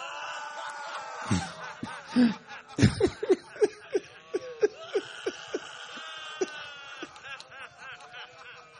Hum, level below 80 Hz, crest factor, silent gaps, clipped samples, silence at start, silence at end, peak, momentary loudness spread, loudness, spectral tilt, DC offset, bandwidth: none; -56 dBFS; 26 dB; none; under 0.1%; 0 s; 0 s; -6 dBFS; 17 LU; -31 LUFS; -5.5 dB/octave; under 0.1%; 10 kHz